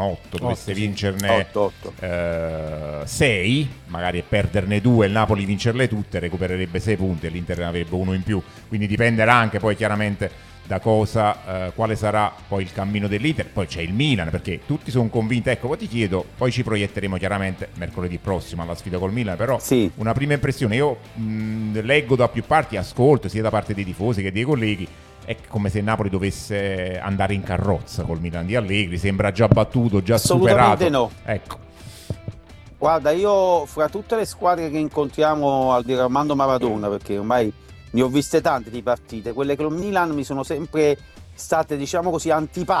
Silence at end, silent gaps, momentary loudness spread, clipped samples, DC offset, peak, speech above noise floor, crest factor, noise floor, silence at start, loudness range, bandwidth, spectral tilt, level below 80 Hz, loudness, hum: 0 s; none; 10 LU; under 0.1%; under 0.1%; 0 dBFS; 22 dB; 22 dB; -43 dBFS; 0 s; 4 LU; 15.5 kHz; -6 dB/octave; -44 dBFS; -21 LUFS; none